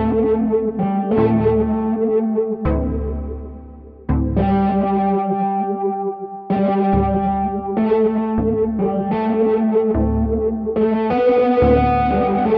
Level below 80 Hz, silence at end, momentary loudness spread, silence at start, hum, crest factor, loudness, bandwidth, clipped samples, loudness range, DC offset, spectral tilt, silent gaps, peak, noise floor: -30 dBFS; 0 s; 8 LU; 0 s; none; 14 dB; -18 LUFS; 5 kHz; under 0.1%; 3 LU; under 0.1%; -11 dB/octave; none; -4 dBFS; -38 dBFS